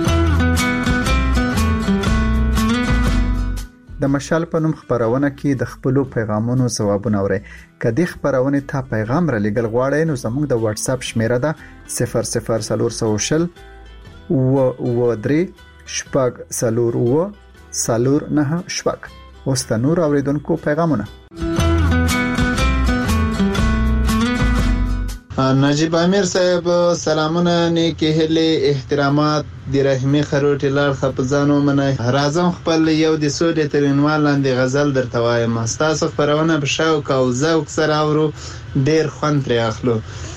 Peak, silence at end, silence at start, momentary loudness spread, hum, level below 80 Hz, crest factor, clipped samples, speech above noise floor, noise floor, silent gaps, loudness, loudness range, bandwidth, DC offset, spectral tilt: -4 dBFS; 0 s; 0 s; 6 LU; none; -28 dBFS; 12 dB; under 0.1%; 21 dB; -38 dBFS; none; -18 LUFS; 3 LU; 15.5 kHz; under 0.1%; -5.5 dB/octave